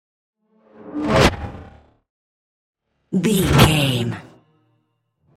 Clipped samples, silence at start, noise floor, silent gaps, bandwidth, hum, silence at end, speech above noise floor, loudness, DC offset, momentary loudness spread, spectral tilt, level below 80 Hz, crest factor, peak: under 0.1%; 0.85 s; -68 dBFS; 2.10-2.73 s; 16 kHz; none; 1.15 s; 52 dB; -17 LUFS; under 0.1%; 19 LU; -5 dB/octave; -36 dBFS; 22 dB; 0 dBFS